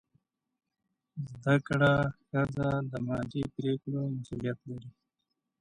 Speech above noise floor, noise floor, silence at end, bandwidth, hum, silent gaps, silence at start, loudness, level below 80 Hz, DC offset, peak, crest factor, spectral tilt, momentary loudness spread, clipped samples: 53 dB; -84 dBFS; 0.7 s; 10 kHz; none; none; 1.15 s; -31 LUFS; -58 dBFS; under 0.1%; -12 dBFS; 20 dB; -8 dB/octave; 16 LU; under 0.1%